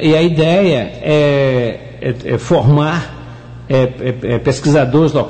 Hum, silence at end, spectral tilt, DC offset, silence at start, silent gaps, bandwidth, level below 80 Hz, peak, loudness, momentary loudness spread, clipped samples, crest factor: none; 0 s; -7 dB/octave; 0.6%; 0 s; none; 9 kHz; -40 dBFS; -2 dBFS; -14 LUFS; 11 LU; under 0.1%; 10 dB